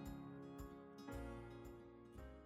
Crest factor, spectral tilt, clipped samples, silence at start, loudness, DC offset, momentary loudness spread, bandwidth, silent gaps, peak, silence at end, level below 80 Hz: 14 dB; -7 dB/octave; under 0.1%; 0 s; -55 LUFS; under 0.1%; 7 LU; 19 kHz; none; -40 dBFS; 0 s; -62 dBFS